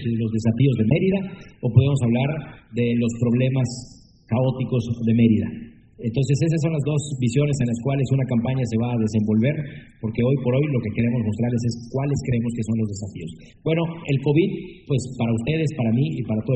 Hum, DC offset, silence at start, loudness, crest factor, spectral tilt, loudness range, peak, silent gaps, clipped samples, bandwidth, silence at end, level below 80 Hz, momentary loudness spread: none; under 0.1%; 0 s; -22 LUFS; 18 dB; -7.5 dB/octave; 3 LU; -2 dBFS; none; under 0.1%; 8.8 kHz; 0 s; -50 dBFS; 10 LU